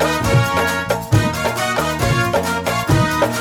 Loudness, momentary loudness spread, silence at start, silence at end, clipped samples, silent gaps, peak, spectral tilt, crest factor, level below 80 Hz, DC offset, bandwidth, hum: -17 LUFS; 4 LU; 0 s; 0 s; under 0.1%; none; -2 dBFS; -5 dB/octave; 14 dB; -34 dBFS; under 0.1%; over 20 kHz; none